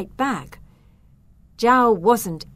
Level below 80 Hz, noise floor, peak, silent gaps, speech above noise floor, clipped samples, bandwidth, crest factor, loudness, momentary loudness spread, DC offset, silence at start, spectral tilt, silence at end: -50 dBFS; -52 dBFS; -4 dBFS; none; 33 dB; under 0.1%; 16 kHz; 18 dB; -19 LUFS; 9 LU; under 0.1%; 0 s; -5 dB/octave; 0.1 s